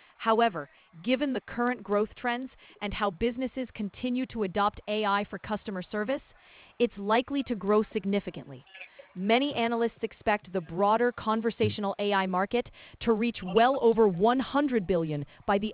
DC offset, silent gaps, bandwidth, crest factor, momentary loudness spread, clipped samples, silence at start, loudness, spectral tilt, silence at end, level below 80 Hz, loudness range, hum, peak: under 0.1%; none; 4 kHz; 18 dB; 11 LU; under 0.1%; 0.2 s; -29 LUFS; -9.5 dB/octave; 0 s; -56 dBFS; 5 LU; none; -10 dBFS